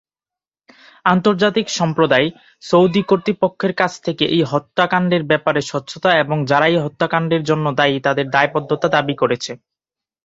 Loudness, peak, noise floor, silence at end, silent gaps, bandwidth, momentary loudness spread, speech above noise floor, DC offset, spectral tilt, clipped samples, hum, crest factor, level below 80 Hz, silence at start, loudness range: -17 LUFS; 0 dBFS; -90 dBFS; 0.7 s; none; 8 kHz; 5 LU; 73 dB; under 0.1%; -5.5 dB/octave; under 0.1%; none; 16 dB; -58 dBFS; 1.05 s; 1 LU